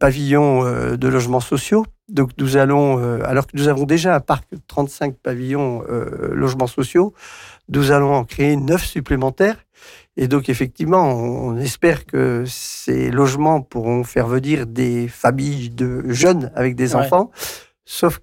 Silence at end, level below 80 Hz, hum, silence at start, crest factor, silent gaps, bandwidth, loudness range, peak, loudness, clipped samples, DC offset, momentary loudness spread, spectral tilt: 0.05 s; -40 dBFS; none; 0 s; 12 dB; none; 17 kHz; 2 LU; -4 dBFS; -18 LUFS; under 0.1%; under 0.1%; 9 LU; -6 dB/octave